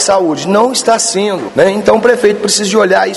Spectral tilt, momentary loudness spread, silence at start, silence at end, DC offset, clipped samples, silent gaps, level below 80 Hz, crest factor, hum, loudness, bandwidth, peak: -3 dB/octave; 3 LU; 0 s; 0 s; under 0.1%; 0.4%; none; -48 dBFS; 10 dB; none; -10 LUFS; 12 kHz; 0 dBFS